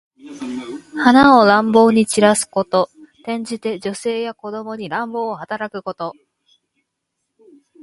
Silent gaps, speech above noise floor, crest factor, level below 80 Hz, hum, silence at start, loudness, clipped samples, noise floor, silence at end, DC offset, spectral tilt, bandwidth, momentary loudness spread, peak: none; 60 dB; 18 dB; -56 dBFS; none; 0.25 s; -16 LUFS; under 0.1%; -76 dBFS; 1.7 s; under 0.1%; -4.5 dB/octave; 11.5 kHz; 18 LU; 0 dBFS